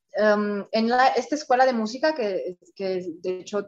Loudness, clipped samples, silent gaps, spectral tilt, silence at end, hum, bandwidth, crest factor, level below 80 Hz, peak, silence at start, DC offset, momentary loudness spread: -24 LUFS; under 0.1%; none; -4.5 dB/octave; 0 s; none; 8 kHz; 18 dB; -74 dBFS; -6 dBFS; 0.15 s; under 0.1%; 11 LU